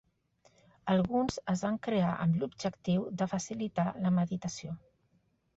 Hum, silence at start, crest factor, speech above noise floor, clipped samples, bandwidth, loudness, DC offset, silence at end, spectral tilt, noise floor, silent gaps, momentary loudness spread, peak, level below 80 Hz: none; 0.85 s; 18 dB; 41 dB; under 0.1%; 8 kHz; -32 LUFS; under 0.1%; 0.8 s; -6.5 dB/octave; -73 dBFS; none; 9 LU; -16 dBFS; -62 dBFS